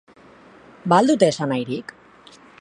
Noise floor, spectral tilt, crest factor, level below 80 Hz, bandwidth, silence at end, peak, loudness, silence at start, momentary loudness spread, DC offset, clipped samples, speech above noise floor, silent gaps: -48 dBFS; -5.5 dB/octave; 20 dB; -66 dBFS; 11.5 kHz; 0.8 s; -2 dBFS; -19 LUFS; 0.85 s; 16 LU; under 0.1%; under 0.1%; 30 dB; none